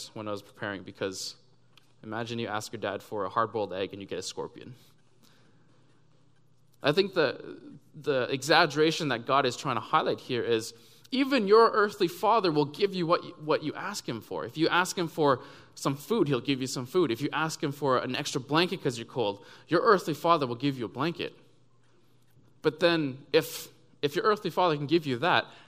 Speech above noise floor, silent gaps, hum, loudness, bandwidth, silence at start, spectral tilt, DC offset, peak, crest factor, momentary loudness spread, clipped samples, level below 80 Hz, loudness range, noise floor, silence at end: 37 dB; none; none; -28 LUFS; 15.5 kHz; 0 s; -4.5 dB/octave; under 0.1%; -6 dBFS; 24 dB; 13 LU; under 0.1%; -74 dBFS; 8 LU; -65 dBFS; 0.1 s